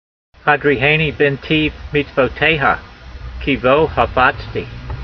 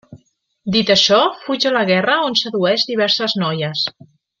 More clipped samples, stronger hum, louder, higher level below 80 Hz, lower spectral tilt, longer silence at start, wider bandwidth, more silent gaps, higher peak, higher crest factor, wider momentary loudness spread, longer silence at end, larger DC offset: neither; neither; about the same, -15 LUFS vs -16 LUFS; first, -34 dBFS vs -60 dBFS; first, -7.5 dB/octave vs -4 dB/octave; first, 0.45 s vs 0.1 s; second, 6.4 kHz vs 7.4 kHz; neither; about the same, 0 dBFS vs 0 dBFS; about the same, 16 dB vs 18 dB; first, 13 LU vs 8 LU; second, 0 s vs 0.5 s; neither